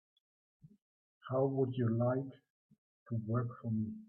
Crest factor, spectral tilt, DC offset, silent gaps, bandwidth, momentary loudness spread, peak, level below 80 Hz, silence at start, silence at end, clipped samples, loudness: 18 dB; -9.5 dB/octave; under 0.1%; 2.50-2.69 s, 2.78-3.06 s; 3.5 kHz; 10 LU; -20 dBFS; -78 dBFS; 1.25 s; 0.05 s; under 0.1%; -36 LUFS